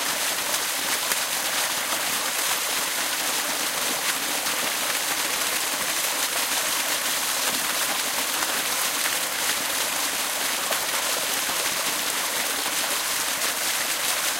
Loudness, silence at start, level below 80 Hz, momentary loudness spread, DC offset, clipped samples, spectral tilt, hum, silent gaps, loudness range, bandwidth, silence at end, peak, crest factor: -23 LUFS; 0 s; -62 dBFS; 1 LU; under 0.1%; under 0.1%; 1 dB/octave; none; none; 1 LU; 16 kHz; 0 s; -4 dBFS; 20 dB